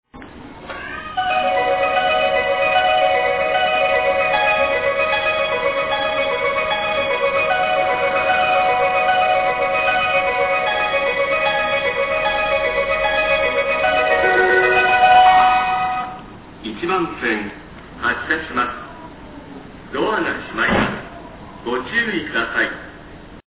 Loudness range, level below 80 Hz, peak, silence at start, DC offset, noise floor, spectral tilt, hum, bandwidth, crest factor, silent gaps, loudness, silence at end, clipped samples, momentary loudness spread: 8 LU; -44 dBFS; -2 dBFS; 0.15 s; 0.2%; -38 dBFS; -7.5 dB/octave; none; 4 kHz; 16 dB; none; -17 LUFS; 0.1 s; under 0.1%; 17 LU